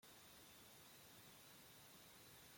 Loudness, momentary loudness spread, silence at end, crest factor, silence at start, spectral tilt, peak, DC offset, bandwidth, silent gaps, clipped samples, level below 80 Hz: -62 LUFS; 0 LU; 0 s; 14 dB; 0 s; -2 dB/octave; -52 dBFS; under 0.1%; 16.5 kHz; none; under 0.1%; -86 dBFS